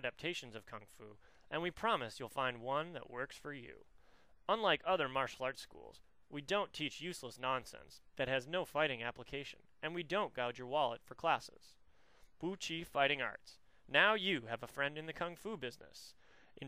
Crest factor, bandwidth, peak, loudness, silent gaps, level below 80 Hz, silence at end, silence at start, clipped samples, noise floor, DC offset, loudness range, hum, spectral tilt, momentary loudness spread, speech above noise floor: 26 dB; 15.5 kHz; -14 dBFS; -39 LUFS; none; -70 dBFS; 0 s; 0 s; under 0.1%; -69 dBFS; under 0.1%; 5 LU; none; -4 dB/octave; 20 LU; 29 dB